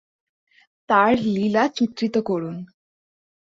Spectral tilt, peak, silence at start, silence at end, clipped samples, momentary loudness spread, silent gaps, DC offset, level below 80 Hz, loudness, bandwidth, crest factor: -6.5 dB/octave; -4 dBFS; 0.9 s; 0.75 s; under 0.1%; 10 LU; none; under 0.1%; -62 dBFS; -21 LUFS; 7.6 kHz; 20 dB